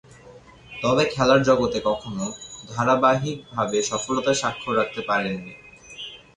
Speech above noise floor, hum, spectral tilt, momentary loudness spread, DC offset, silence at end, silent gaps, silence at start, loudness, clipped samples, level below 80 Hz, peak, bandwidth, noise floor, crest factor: 25 dB; none; -4.5 dB/octave; 18 LU; under 0.1%; 0.2 s; none; 0.25 s; -22 LUFS; under 0.1%; -52 dBFS; -6 dBFS; 11 kHz; -47 dBFS; 18 dB